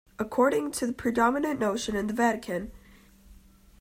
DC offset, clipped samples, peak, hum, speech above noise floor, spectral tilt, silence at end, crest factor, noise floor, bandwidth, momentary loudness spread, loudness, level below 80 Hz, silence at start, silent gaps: under 0.1%; under 0.1%; -10 dBFS; none; 28 dB; -4.5 dB/octave; 0.45 s; 20 dB; -55 dBFS; 16 kHz; 9 LU; -27 LUFS; -54 dBFS; 0.2 s; none